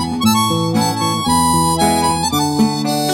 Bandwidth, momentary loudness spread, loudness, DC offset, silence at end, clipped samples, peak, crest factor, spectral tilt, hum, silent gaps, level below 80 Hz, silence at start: 16.5 kHz; 3 LU; -15 LUFS; under 0.1%; 0 s; under 0.1%; 0 dBFS; 14 dB; -4 dB/octave; none; none; -38 dBFS; 0 s